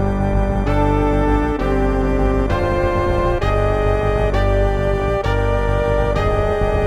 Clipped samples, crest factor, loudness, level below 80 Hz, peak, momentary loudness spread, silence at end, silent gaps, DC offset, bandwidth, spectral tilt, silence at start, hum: under 0.1%; 12 dB; -18 LUFS; -20 dBFS; -4 dBFS; 2 LU; 0 s; none; under 0.1%; 10 kHz; -8 dB/octave; 0 s; none